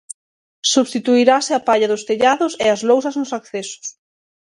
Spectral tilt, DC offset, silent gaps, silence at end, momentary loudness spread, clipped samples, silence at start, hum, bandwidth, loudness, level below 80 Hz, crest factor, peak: -2.5 dB/octave; under 0.1%; 0.14-0.62 s; 0.5 s; 15 LU; under 0.1%; 0.1 s; none; 11.5 kHz; -17 LUFS; -66 dBFS; 18 dB; 0 dBFS